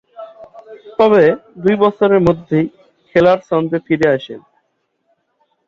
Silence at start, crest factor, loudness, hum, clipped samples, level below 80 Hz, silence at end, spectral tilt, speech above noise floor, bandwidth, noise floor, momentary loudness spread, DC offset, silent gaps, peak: 0.2 s; 14 dB; -14 LUFS; none; under 0.1%; -48 dBFS; 1.3 s; -8 dB/octave; 54 dB; 7.4 kHz; -67 dBFS; 21 LU; under 0.1%; none; -2 dBFS